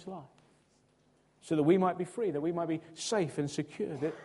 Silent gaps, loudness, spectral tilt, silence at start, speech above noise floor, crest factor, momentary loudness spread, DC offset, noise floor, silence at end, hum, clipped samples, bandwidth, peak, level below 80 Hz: none; -32 LUFS; -6 dB/octave; 0 s; 37 dB; 20 dB; 10 LU; under 0.1%; -69 dBFS; 0 s; none; under 0.1%; 11.5 kHz; -14 dBFS; -74 dBFS